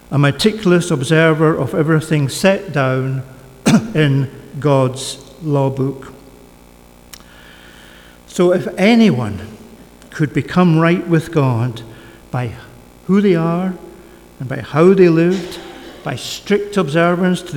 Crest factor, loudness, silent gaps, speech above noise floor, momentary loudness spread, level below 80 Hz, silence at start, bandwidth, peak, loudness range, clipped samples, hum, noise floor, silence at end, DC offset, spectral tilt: 16 dB; -15 LUFS; none; 29 dB; 16 LU; -48 dBFS; 0.1 s; 18 kHz; 0 dBFS; 6 LU; under 0.1%; 60 Hz at -40 dBFS; -43 dBFS; 0 s; under 0.1%; -6.5 dB/octave